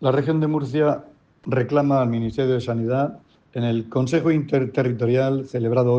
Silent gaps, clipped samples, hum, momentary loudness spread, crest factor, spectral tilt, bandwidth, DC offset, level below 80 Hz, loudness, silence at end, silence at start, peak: none; under 0.1%; none; 6 LU; 14 dB; -8.5 dB/octave; 8.4 kHz; under 0.1%; -56 dBFS; -22 LUFS; 0 s; 0 s; -6 dBFS